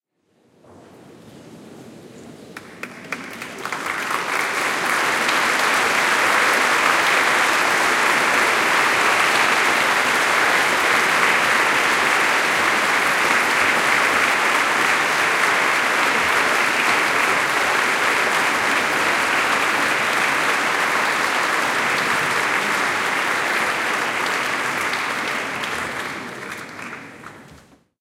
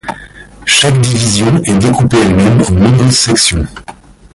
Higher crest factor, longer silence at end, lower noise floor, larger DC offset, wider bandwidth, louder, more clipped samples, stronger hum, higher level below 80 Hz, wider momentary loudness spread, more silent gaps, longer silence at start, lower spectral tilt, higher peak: first, 18 dB vs 10 dB; about the same, 0.45 s vs 0.4 s; first, -62 dBFS vs -33 dBFS; neither; first, 17 kHz vs 11.5 kHz; second, -17 LUFS vs -9 LUFS; neither; neither; second, -60 dBFS vs -26 dBFS; about the same, 11 LU vs 11 LU; neither; first, 1.1 s vs 0.05 s; second, -1 dB/octave vs -4.5 dB/octave; about the same, -2 dBFS vs 0 dBFS